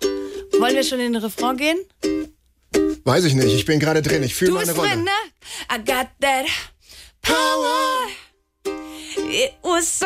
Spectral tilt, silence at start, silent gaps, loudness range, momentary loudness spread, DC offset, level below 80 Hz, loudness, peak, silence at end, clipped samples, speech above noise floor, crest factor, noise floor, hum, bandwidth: -4 dB/octave; 0 s; none; 3 LU; 12 LU; under 0.1%; -48 dBFS; -20 LUFS; -6 dBFS; 0 s; under 0.1%; 27 dB; 16 dB; -46 dBFS; none; 16 kHz